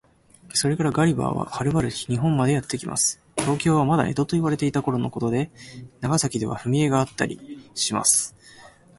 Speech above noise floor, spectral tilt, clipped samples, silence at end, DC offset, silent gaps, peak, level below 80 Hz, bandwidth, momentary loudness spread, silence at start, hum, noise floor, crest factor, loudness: 27 dB; -4.5 dB/octave; under 0.1%; 0.3 s; under 0.1%; none; -4 dBFS; -52 dBFS; 12 kHz; 8 LU; 0.55 s; none; -49 dBFS; 20 dB; -23 LUFS